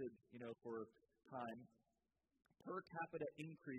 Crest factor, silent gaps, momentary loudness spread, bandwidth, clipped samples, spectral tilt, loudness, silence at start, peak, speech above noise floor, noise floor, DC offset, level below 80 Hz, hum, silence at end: 18 dB; none; 9 LU; 8.2 kHz; under 0.1%; -7 dB/octave; -53 LUFS; 0 s; -36 dBFS; 38 dB; -90 dBFS; under 0.1%; -90 dBFS; none; 0 s